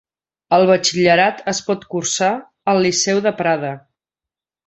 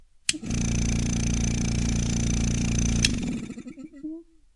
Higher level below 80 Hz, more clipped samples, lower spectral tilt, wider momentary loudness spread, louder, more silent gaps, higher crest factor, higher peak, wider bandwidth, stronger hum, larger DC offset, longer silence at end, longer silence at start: second, -60 dBFS vs -32 dBFS; neither; about the same, -3.5 dB/octave vs -4 dB/octave; second, 9 LU vs 15 LU; first, -17 LUFS vs -26 LUFS; neither; second, 16 dB vs 24 dB; about the same, -2 dBFS vs -2 dBFS; second, 8.2 kHz vs 11.5 kHz; neither; neither; first, 0.9 s vs 0.35 s; first, 0.5 s vs 0.3 s